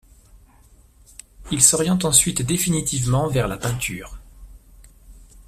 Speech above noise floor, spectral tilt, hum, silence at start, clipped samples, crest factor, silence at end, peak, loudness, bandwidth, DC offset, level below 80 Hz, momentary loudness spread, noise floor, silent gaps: 32 dB; -3.5 dB/octave; none; 1.4 s; under 0.1%; 24 dB; 0.05 s; 0 dBFS; -18 LUFS; 16 kHz; under 0.1%; -42 dBFS; 13 LU; -52 dBFS; none